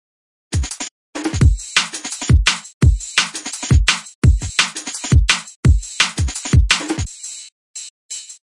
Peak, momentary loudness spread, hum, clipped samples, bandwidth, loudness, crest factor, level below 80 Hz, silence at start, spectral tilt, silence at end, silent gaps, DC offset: -2 dBFS; 15 LU; none; under 0.1%; 11.5 kHz; -17 LUFS; 16 dB; -22 dBFS; 0.5 s; -3.5 dB/octave; 0.15 s; 0.91-1.13 s, 2.74-2.81 s, 4.15-4.22 s, 5.56-5.63 s, 7.52-7.74 s, 7.90-8.09 s; under 0.1%